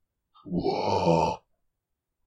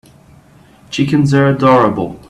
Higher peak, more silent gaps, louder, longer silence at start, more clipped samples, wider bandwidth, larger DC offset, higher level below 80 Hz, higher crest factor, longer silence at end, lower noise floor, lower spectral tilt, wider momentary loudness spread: second, -10 dBFS vs 0 dBFS; neither; second, -26 LUFS vs -12 LUFS; second, 0.45 s vs 0.9 s; neither; about the same, 10 kHz vs 11 kHz; neither; second, -54 dBFS vs -46 dBFS; about the same, 18 dB vs 14 dB; first, 0.9 s vs 0.15 s; first, -83 dBFS vs -44 dBFS; about the same, -6.5 dB/octave vs -7 dB/octave; about the same, 10 LU vs 8 LU